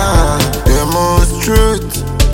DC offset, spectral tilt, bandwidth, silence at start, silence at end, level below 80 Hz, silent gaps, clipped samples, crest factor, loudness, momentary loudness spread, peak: under 0.1%; -5 dB/octave; 17 kHz; 0 s; 0 s; -14 dBFS; none; under 0.1%; 10 dB; -13 LUFS; 3 LU; 0 dBFS